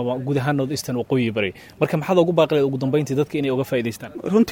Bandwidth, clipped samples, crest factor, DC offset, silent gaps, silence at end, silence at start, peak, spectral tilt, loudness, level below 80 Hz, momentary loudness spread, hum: 19 kHz; under 0.1%; 18 dB; under 0.1%; none; 0 s; 0 s; -4 dBFS; -6.5 dB/octave; -21 LUFS; -58 dBFS; 7 LU; none